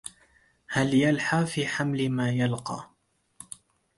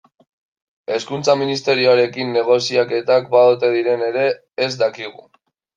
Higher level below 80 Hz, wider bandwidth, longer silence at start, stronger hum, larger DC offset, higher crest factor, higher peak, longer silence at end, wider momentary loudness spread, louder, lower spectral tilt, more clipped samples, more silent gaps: first, -62 dBFS vs -68 dBFS; first, 11.5 kHz vs 7.6 kHz; second, 0.05 s vs 0.9 s; neither; neither; about the same, 18 dB vs 16 dB; second, -10 dBFS vs -2 dBFS; about the same, 0.55 s vs 0.65 s; first, 21 LU vs 10 LU; second, -26 LUFS vs -17 LUFS; about the same, -5.5 dB/octave vs -4.5 dB/octave; neither; neither